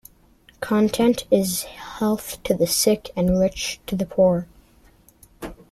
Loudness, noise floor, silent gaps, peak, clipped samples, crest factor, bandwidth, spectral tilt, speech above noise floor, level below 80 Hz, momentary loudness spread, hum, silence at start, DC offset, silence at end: -21 LUFS; -54 dBFS; none; -4 dBFS; under 0.1%; 20 dB; 16 kHz; -4.5 dB/octave; 34 dB; -46 dBFS; 16 LU; none; 0.6 s; under 0.1%; 0.15 s